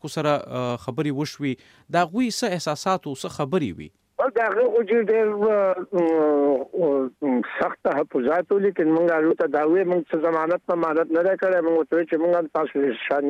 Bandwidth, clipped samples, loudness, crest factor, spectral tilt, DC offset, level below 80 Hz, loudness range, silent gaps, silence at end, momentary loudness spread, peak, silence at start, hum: 14.5 kHz; under 0.1%; -22 LUFS; 14 dB; -6 dB/octave; under 0.1%; -66 dBFS; 4 LU; none; 0 s; 7 LU; -8 dBFS; 0.05 s; none